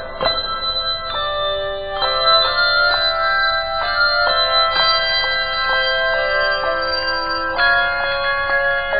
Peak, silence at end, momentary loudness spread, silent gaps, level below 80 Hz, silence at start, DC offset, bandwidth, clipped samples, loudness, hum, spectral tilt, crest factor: -2 dBFS; 0 s; 6 LU; none; -36 dBFS; 0 s; under 0.1%; 5 kHz; under 0.1%; -16 LUFS; none; 2 dB/octave; 16 dB